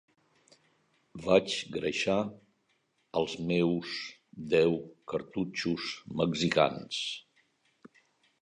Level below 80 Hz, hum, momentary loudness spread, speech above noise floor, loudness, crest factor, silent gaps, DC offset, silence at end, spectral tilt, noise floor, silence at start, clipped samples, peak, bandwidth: -64 dBFS; none; 12 LU; 44 dB; -31 LUFS; 24 dB; none; under 0.1%; 0.55 s; -5 dB/octave; -74 dBFS; 1.15 s; under 0.1%; -8 dBFS; 10.5 kHz